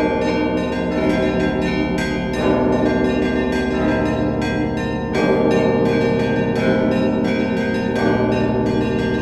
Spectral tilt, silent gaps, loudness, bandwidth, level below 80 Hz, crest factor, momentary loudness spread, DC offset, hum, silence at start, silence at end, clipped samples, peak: -7 dB/octave; none; -18 LUFS; 12 kHz; -34 dBFS; 14 dB; 4 LU; 0.4%; none; 0 s; 0 s; under 0.1%; -4 dBFS